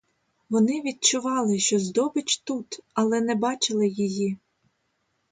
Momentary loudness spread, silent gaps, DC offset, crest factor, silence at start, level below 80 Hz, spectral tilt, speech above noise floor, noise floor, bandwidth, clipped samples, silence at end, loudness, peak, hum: 8 LU; none; under 0.1%; 20 dB; 0.5 s; -70 dBFS; -3.5 dB/octave; 49 dB; -73 dBFS; 9.6 kHz; under 0.1%; 0.95 s; -24 LUFS; -6 dBFS; none